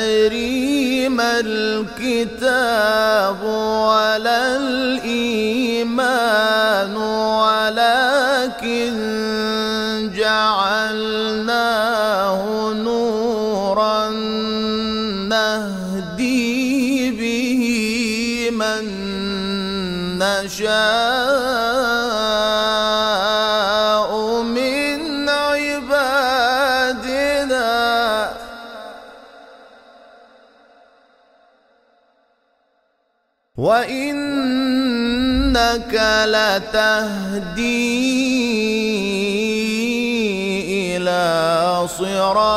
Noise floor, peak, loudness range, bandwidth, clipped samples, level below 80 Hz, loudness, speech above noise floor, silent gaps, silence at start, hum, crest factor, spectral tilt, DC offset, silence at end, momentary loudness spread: -67 dBFS; -2 dBFS; 3 LU; 16 kHz; under 0.1%; -42 dBFS; -18 LUFS; 50 dB; none; 0 s; none; 16 dB; -3.5 dB/octave; under 0.1%; 0 s; 6 LU